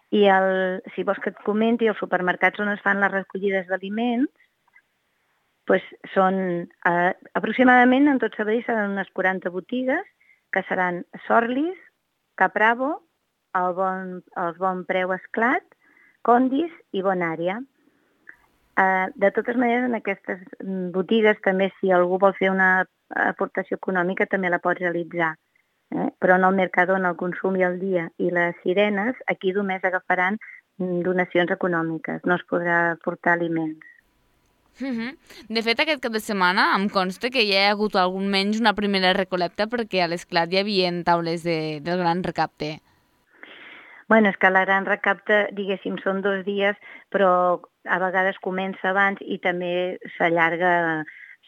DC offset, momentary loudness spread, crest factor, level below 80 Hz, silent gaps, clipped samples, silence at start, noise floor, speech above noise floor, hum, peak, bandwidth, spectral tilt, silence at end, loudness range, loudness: under 0.1%; 10 LU; 20 dB; -66 dBFS; none; under 0.1%; 0.1 s; -70 dBFS; 48 dB; none; -2 dBFS; 13.5 kHz; -6 dB/octave; 0.15 s; 5 LU; -22 LUFS